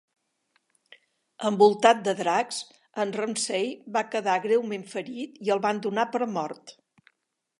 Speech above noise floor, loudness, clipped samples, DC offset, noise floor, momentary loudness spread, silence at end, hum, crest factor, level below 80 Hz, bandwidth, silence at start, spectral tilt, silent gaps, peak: 53 dB; -26 LUFS; under 0.1%; under 0.1%; -78 dBFS; 14 LU; 0.9 s; none; 24 dB; -82 dBFS; 11.5 kHz; 1.4 s; -4 dB/octave; none; -2 dBFS